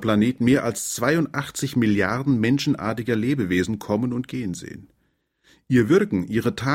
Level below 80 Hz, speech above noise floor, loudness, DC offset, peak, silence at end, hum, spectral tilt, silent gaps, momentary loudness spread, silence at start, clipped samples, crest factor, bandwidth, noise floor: -52 dBFS; 48 dB; -22 LUFS; under 0.1%; -6 dBFS; 0 s; none; -5.5 dB/octave; none; 8 LU; 0 s; under 0.1%; 16 dB; 16.5 kHz; -69 dBFS